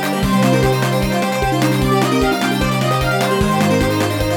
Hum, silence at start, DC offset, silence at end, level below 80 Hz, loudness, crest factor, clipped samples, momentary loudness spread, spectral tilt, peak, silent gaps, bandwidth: none; 0 s; under 0.1%; 0 s; -30 dBFS; -16 LUFS; 14 dB; under 0.1%; 3 LU; -5.5 dB/octave; -2 dBFS; none; 17.5 kHz